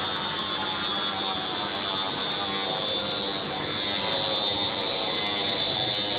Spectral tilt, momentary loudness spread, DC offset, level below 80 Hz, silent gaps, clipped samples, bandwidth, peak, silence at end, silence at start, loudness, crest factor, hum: -6 dB/octave; 3 LU; under 0.1%; -58 dBFS; none; under 0.1%; 9.8 kHz; -14 dBFS; 0 s; 0 s; -27 LUFS; 16 dB; none